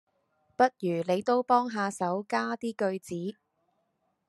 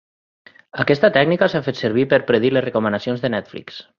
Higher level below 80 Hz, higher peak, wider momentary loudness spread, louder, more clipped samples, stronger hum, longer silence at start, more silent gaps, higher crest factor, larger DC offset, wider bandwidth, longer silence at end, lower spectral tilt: second, -80 dBFS vs -58 dBFS; second, -10 dBFS vs -2 dBFS; about the same, 11 LU vs 11 LU; second, -29 LUFS vs -18 LUFS; neither; neither; second, 0.6 s vs 0.75 s; neither; about the same, 20 dB vs 18 dB; neither; first, 12.5 kHz vs 7 kHz; first, 1 s vs 0.15 s; second, -5.5 dB/octave vs -7 dB/octave